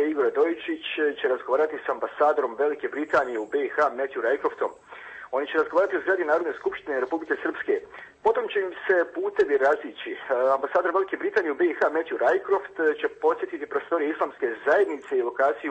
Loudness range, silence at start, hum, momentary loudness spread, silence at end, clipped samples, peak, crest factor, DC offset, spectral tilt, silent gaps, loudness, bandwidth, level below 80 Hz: 2 LU; 0 s; none; 7 LU; 0 s; under 0.1%; -10 dBFS; 16 dB; under 0.1%; -4.5 dB/octave; none; -25 LUFS; 8.4 kHz; -68 dBFS